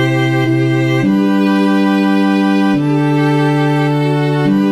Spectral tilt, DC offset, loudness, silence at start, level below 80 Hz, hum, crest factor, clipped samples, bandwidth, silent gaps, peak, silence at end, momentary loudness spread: -7.5 dB/octave; 0.3%; -13 LUFS; 0 s; -58 dBFS; none; 10 dB; under 0.1%; 13 kHz; none; -2 dBFS; 0 s; 1 LU